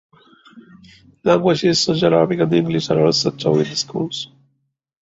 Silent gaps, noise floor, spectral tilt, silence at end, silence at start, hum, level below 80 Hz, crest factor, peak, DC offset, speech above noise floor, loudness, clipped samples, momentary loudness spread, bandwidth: none; -70 dBFS; -5 dB/octave; 0.8 s; 0.55 s; none; -54 dBFS; 18 dB; -2 dBFS; under 0.1%; 53 dB; -17 LUFS; under 0.1%; 9 LU; 8 kHz